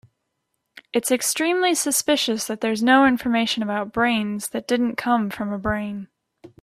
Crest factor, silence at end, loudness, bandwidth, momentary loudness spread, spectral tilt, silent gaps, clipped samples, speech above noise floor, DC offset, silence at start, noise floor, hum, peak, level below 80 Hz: 18 dB; 0.15 s; -21 LUFS; 16 kHz; 10 LU; -3 dB/octave; none; under 0.1%; 55 dB; under 0.1%; 0.95 s; -76 dBFS; none; -4 dBFS; -52 dBFS